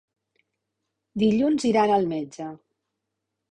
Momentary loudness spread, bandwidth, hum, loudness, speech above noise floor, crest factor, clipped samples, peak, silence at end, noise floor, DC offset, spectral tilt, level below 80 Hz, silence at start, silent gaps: 17 LU; 10 kHz; none; -22 LUFS; 60 dB; 18 dB; under 0.1%; -8 dBFS; 0.95 s; -82 dBFS; under 0.1%; -6 dB/octave; -62 dBFS; 1.15 s; none